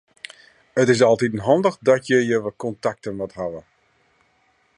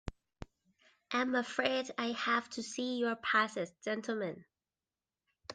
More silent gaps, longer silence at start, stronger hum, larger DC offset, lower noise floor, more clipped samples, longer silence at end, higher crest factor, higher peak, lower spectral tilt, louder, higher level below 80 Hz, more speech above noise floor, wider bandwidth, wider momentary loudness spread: neither; first, 0.75 s vs 0.05 s; neither; neither; second, -63 dBFS vs under -90 dBFS; neither; first, 1.15 s vs 0 s; about the same, 18 dB vs 20 dB; first, -4 dBFS vs -16 dBFS; first, -5.5 dB/octave vs -3.5 dB/octave; first, -20 LUFS vs -35 LUFS; about the same, -58 dBFS vs -60 dBFS; second, 43 dB vs over 55 dB; about the same, 11 kHz vs 10 kHz; second, 19 LU vs 22 LU